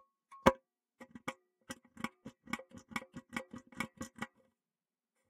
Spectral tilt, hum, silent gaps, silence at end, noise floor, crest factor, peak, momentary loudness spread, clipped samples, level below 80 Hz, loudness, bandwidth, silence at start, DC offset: -4.5 dB/octave; none; none; 1.05 s; under -90 dBFS; 32 dB; -10 dBFS; 24 LU; under 0.1%; -64 dBFS; -40 LUFS; 15.5 kHz; 0.3 s; under 0.1%